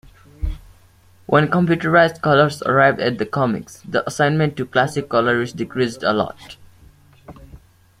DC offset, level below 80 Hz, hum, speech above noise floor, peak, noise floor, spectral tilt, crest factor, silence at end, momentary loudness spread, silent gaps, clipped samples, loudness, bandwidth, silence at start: under 0.1%; -40 dBFS; none; 33 dB; -2 dBFS; -51 dBFS; -6 dB/octave; 18 dB; 0.45 s; 13 LU; none; under 0.1%; -18 LUFS; 15 kHz; 0.4 s